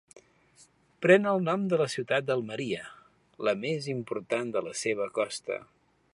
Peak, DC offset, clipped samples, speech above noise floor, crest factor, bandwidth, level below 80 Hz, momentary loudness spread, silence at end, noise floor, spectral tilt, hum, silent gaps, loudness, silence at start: -8 dBFS; under 0.1%; under 0.1%; 33 dB; 22 dB; 11.5 kHz; -74 dBFS; 13 LU; 0.5 s; -61 dBFS; -5 dB/octave; none; none; -29 LUFS; 1 s